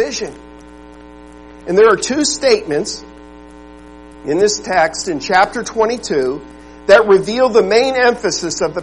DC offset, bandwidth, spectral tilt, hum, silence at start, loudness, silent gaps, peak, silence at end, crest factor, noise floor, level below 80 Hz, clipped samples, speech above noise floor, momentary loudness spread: 0.3%; 11.5 kHz; -3 dB/octave; none; 0 s; -14 LUFS; none; 0 dBFS; 0 s; 16 dB; -37 dBFS; -44 dBFS; under 0.1%; 23 dB; 13 LU